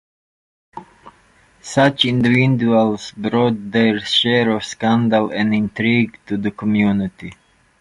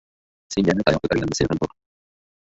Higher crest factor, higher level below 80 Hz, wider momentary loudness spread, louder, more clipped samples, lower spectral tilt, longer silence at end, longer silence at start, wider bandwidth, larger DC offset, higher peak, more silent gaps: about the same, 18 dB vs 20 dB; second, -52 dBFS vs -44 dBFS; about the same, 9 LU vs 9 LU; first, -17 LUFS vs -22 LUFS; neither; about the same, -6 dB/octave vs -5.5 dB/octave; second, 0.5 s vs 0.75 s; first, 0.75 s vs 0.5 s; first, 11.5 kHz vs 8 kHz; neither; first, 0 dBFS vs -4 dBFS; neither